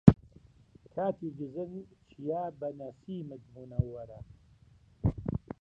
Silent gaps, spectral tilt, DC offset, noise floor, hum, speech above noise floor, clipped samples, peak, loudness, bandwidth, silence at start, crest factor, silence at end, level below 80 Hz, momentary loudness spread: none; -11 dB/octave; under 0.1%; -61 dBFS; none; 24 dB; under 0.1%; 0 dBFS; -35 LUFS; 6 kHz; 0.05 s; 32 dB; 0.25 s; -48 dBFS; 14 LU